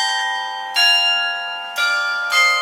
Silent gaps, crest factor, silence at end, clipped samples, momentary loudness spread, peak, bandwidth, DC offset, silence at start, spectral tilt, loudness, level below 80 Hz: none; 16 dB; 0 s; under 0.1%; 11 LU; -2 dBFS; 16.5 kHz; under 0.1%; 0 s; 4 dB/octave; -16 LUFS; under -90 dBFS